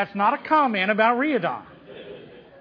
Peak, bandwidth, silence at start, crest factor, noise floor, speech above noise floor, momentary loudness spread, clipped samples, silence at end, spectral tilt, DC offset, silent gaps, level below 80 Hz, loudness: -6 dBFS; 5.2 kHz; 0 s; 18 dB; -43 dBFS; 22 dB; 21 LU; under 0.1%; 0.2 s; -7.5 dB/octave; under 0.1%; none; -68 dBFS; -21 LUFS